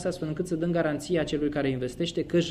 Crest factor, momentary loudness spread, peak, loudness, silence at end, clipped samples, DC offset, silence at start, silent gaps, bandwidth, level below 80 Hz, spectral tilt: 14 dB; 4 LU; -14 dBFS; -28 LUFS; 0 s; under 0.1%; under 0.1%; 0 s; none; 13 kHz; -50 dBFS; -6 dB/octave